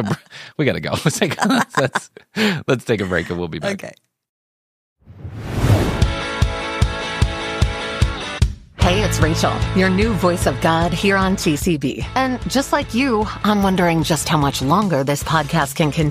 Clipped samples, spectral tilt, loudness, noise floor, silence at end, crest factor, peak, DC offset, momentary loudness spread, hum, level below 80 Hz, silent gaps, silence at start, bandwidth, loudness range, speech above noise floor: under 0.1%; -5 dB/octave; -19 LUFS; under -90 dBFS; 0 s; 16 dB; -2 dBFS; under 0.1%; 7 LU; none; -30 dBFS; 4.29-4.96 s; 0 s; 15.5 kHz; 6 LU; over 72 dB